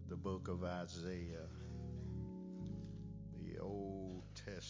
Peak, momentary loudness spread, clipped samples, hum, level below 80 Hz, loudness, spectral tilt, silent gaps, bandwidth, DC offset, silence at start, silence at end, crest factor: -30 dBFS; 7 LU; under 0.1%; none; -56 dBFS; -48 LUFS; -6.5 dB/octave; none; 7.6 kHz; under 0.1%; 0 s; 0 s; 16 dB